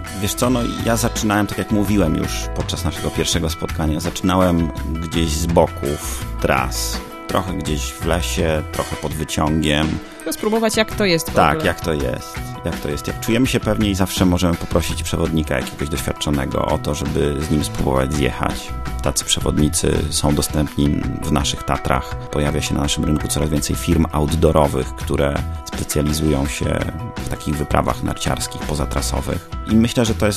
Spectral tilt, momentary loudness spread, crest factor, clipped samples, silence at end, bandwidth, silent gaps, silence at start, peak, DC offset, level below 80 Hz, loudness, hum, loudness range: -5 dB/octave; 7 LU; 18 dB; under 0.1%; 0 s; 14 kHz; none; 0 s; 0 dBFS; under 0.1%; -28 dBFS; -20 LUFS; none; 2 LU